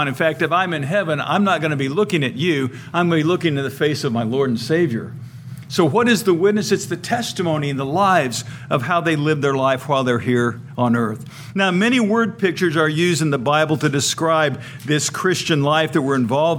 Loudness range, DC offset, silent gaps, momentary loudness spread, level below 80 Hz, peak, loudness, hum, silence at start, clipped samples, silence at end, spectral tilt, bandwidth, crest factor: 2 LU; under 0.1%; none; 6 LU; -60 dBFS; -2 dBFS; -19 LUFS; none; 0 s; under 0.1%; 0 s; -5 dB/octave; 18 kHz; 16 dB